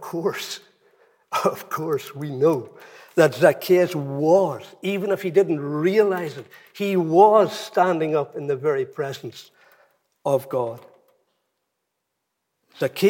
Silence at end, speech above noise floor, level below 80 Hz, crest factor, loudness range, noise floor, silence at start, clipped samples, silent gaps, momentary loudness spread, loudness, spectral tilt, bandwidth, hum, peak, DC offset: 0 s; 57 dB; -80 dBFS; 20 dB; 10 LU; -78 dBFS; 0 s; under 0.1%; none; 14 LU; -21 LUFS; -6 dB/octave; 17 kHz; none; -2 dBFS; under 0.1%